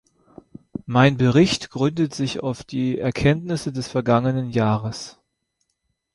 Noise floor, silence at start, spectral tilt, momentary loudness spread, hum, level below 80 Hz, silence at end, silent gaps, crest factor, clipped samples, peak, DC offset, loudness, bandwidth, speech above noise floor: -74 dBFS; 0.85 s; -6.5 dB/octave; 12 LU; none; -48 dBFS; 1.05 s; none; 18 dB; under 0.1%; -4 dBFS; under 0.1%; -21 LUFS; 11.5 kHz; 54 dB